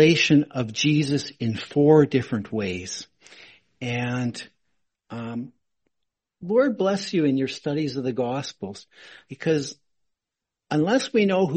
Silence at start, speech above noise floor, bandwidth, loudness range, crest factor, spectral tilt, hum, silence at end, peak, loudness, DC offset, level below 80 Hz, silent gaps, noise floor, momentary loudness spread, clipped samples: 0 s; 64 dB; 8.8 kHz; 9 LU; 20 dB; -5.5 dB/octave; none; 0 s; -4 dBFS; -23 LUFS; under 0.1%; -62 dBFS; none; -87 dBFS; 19 LU; under 0.1%